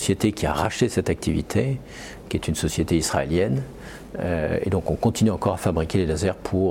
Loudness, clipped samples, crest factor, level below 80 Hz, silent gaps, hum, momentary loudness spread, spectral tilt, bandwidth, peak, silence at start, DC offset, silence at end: -24 LUFS; under 0.1%; 16 dB; -40 dBFS; none; none; 9 LU; -5.5 dB/octave; 17 kHz; -6 dBFS; 0 s; under 0.1%; 0 s